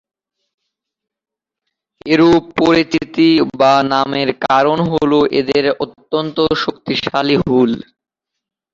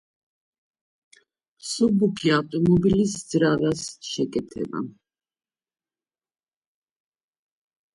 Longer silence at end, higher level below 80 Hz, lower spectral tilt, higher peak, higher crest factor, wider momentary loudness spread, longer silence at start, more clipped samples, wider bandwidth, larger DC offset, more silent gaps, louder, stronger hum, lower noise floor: second, 0.9 s vs 3.05 s; first, -48 dBFS vs -54 dBFS; about the same, -6 dB/octave vs -5.5 dB/octave; first, 0 dBFS vs -8 dBFS; about the same, 14 dB vs 18 dB; second, 7 LU vs 12 LU; first, 2.05 s vs 1.65 s; neither; second, 7.6 kHz vs 11.5 kHz; neither; neither; first, -14 LUFS vs -23 LUFS; neither; second, -85 dBFS vs under -90 dBFS